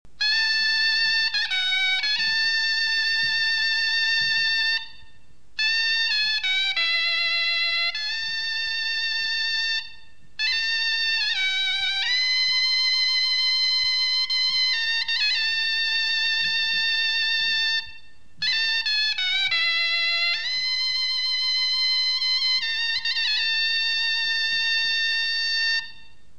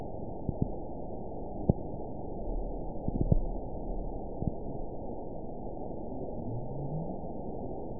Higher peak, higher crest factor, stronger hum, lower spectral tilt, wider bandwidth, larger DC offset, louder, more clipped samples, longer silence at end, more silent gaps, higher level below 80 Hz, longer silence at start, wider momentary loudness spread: about the same, -12 dBFS vs -10 dBFS; second, 12 dB vs 26 dB; neither; second, 2 dB/octave vs -16.5 dB/octave; first, 11 kHz vs 1 kHz; about the same, 1% vs 0.9%; first, -21 LUFS vs -38 LUFS; neither; first, 0.45 s vs 0 s; neither; second, -62 dBFS vs -40 dBFS; first, 0.2 s vs 0 s; second, 4 LU vs 9 LU